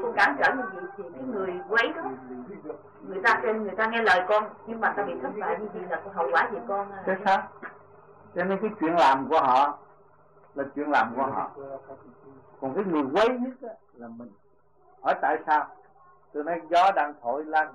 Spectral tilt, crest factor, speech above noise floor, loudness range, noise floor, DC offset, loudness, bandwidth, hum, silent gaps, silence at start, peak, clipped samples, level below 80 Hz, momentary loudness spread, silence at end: -5 dB/octave; 16 dB; 36 dB; 5 LU; -62 dBFS; under 0.1%; -26 LUFS; 11 kHz; none; none; 0 s; -10 dBFS; under 0.1%; -70 dBFS; 19 LU; 0 s